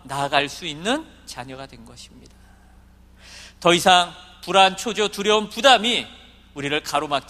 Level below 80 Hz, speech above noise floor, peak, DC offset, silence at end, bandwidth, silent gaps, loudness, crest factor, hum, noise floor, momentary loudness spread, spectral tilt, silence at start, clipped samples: -52 dBFS; 29 dB; 0 dBFS; under 0.1%; 0.1 s; 15.5 kHz; none; -19 LUFS; 22 dB; none; -50 dBFS; 22 LU; -2.5 dB/octave; 0.05 s; under 0.1%